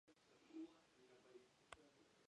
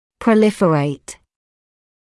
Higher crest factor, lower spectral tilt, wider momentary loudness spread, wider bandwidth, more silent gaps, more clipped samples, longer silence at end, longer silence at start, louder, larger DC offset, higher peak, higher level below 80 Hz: first, 28 dB vs 16 dB; second, -4 dB/octave vs -7 dB/octave; second, 10 LU vs 17 LU; second, 10.5 kHz vs 12 kHz; neither; neither; second, 0.05 s vs 1.05 s; second, 0.05 s vs 0.2 s; second, -63 LUFS vs -16 LUFS; neither; second, -36 dBFS vs -4 dBFS; second, under -90 dBFS vs -56 dBFS